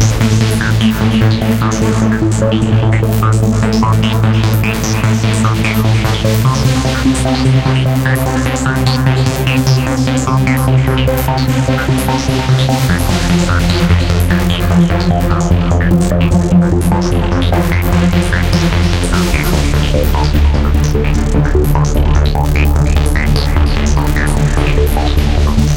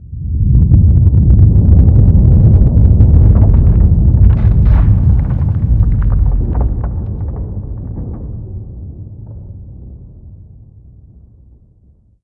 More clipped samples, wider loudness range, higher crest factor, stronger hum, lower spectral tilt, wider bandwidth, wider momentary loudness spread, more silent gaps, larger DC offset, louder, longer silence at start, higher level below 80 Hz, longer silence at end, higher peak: second, under 0.1% vs 0.5%; second, 1 LU vs 20 LU; about the same, 10 dB vs 10 dB; neither; second, -6 dB/octave vs -13 dB/octave; first, 17.5 kHz vs 2.3 kHz; second, 2 LU vs 21 LU; neither; second, 0.2% vs 0.6%; about the same, -12 LUFS vs -11 LUFS; about the same, 0 s vs 0 s; about the same, -16 dBFS vs -14 dBFS; second, 0 s vs 1.9 s; about the same, 0 dBFS vs 0 dBFS